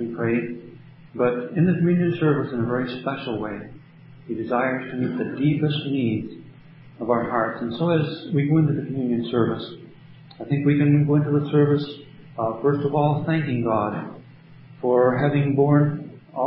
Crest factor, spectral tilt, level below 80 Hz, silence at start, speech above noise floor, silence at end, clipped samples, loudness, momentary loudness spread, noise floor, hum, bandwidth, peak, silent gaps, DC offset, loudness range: 16 dB; -12.5 dB/octave; -58 dBFS; 0 s; 25 dB; 0 s; under 0.1%; -22 LUFS; 15 LU; -46 dBFS; none; 5.4 kHz; -6 dBFS; none; under 0.1%; 4 LU